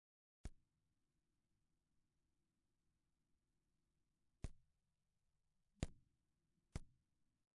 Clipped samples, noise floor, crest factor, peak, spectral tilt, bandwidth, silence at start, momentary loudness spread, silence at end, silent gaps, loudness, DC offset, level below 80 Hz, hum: under 0.1%; -90 dBFS; 36 dB; -26 dBFS; -8.5 dB/octave; 1.1 kHz; 0.45 s; 9 LU; 0.65 s; none; -57 LUFS; under 0.1%; -64 dBFS; none